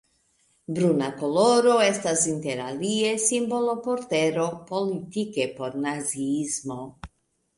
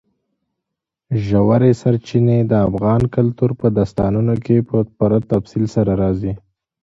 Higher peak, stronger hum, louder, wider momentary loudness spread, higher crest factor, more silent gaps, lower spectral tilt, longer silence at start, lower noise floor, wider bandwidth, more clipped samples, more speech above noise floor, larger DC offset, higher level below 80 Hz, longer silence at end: second, -8 dBFS vs -2 dBFS; neither; second, -24 LUFS vs -17 LUFS; first, 10 LU vs 6 LU; about the same, 18 dB vs 16 dB; neither; second, -4 dB/octave vs -9.5 dB/octave; second, 0.7 s vs 1.1 s; second, -67 dBFS vs -81 dBFS; first, 11.5 kHz vs 7.8 kHz; neither; second, 42 dB vs 66 dB; neither; second, -60 dBFS vs -40 dBFS; about the same, 0.5 s vs 0.45 s